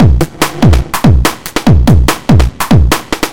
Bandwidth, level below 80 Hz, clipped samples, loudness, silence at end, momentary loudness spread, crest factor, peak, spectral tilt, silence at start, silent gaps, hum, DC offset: 17.5 kHz; -14 dBFS; 3%; -10 LUFS; 0 s; 6 LU; 8 dB; 0 dBFS; -6 dB/octave; 0 s; none; none; 10%